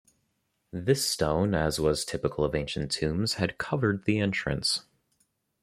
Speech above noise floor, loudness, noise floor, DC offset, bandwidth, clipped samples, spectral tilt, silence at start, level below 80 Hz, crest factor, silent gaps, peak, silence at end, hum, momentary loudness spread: 48 dB; -28 LUFS; -76 dBFS; under 0.1%; 16 kHz; under 0.1%; -4.5 dB/octave; 0.75 s; -48 dBFS; 20 dB; none; -10 dBFS; 0.8 s; none; 5 LU